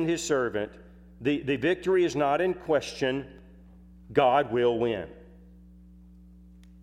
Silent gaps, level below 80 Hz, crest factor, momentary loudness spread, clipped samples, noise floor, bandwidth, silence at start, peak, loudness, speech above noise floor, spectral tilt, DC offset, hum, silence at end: none; -54 dBFS; 20 dB; 12 LU; under 0.1%; -51 dBFS; 13.5 kHz; 0 s; -8 dBFS; -27 LUFS; 25 dB; -5 dB/octave; under 0.1%; none; 1.55 s